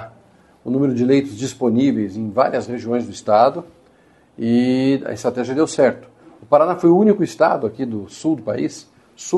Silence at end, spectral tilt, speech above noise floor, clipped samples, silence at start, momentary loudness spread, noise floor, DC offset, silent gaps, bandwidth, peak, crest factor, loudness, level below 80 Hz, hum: 0 s; -6.5 dB/octave; 36 dB; under 0.1%; 0 s; 12 LU; -53 dBFS; under 0.1%; none; 12 kHz; -2 dBFS; 16 dB; -18 LUFS; -60 dBFS; none